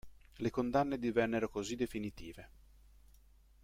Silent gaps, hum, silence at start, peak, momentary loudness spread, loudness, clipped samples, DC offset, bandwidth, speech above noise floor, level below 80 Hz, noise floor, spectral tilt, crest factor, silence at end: none; none; 0.05 s; -18 dBFS; 17 LU; -36 LUFS; under 0.1%; under 0.1%; 16 kHz; 27 dB; -60 dBFS; -64 dBFS; -6 dB/octave; 20 dB; 1.15 s